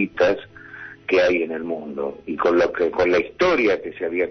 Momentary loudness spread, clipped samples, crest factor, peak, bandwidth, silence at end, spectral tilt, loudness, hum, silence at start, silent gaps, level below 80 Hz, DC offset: 11 LU; under 0.1%; 14 dB; -8 dBFS; 6.4 kHz; 0 s; -5.5 dB/octave; -21 LUFS; none; 0 s; none; -52 dBFS; under 0.1%